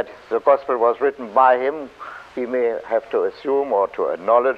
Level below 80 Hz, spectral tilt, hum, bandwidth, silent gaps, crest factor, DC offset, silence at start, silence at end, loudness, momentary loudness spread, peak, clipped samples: -62 dBFS; -6 dB/octave; none; 6.8 kHz; none; 18 dB; under 0.1%; 0 s; 0 s; -20 LUFS; 13 LU; -2 dBFS; under 0.1%